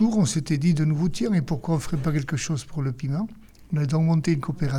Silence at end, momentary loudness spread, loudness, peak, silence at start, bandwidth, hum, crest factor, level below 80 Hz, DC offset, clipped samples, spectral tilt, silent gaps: 0 s; 7 LU; -25 LUFS; -10 dBFS; 0 s; 12.5 kHz; none; 12 dB; -46 dBFS; under 0.1%; under 0.1%; -6.5 dB/octave; none